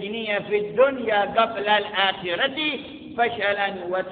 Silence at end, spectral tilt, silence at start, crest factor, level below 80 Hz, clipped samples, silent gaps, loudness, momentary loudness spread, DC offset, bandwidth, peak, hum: 0 s; -8.5 dB/octave; 0 s; 18 dB; -60 dBFS; under 0.1%; none; -23 LUFS; 6 LU; under 0.1%; 4.7 kHz; -4 dBFS; none